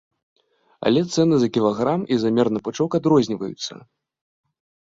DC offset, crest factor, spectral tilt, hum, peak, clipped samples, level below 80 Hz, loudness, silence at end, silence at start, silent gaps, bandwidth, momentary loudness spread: under 0.1%; 16 dB; -6.5 dB/octave; none; -4 dBFS; under 0.1%; -60 dBFS; -20 LUFS; 1.1 s; 0.8 s; none; 7.8 kHz; 9 LU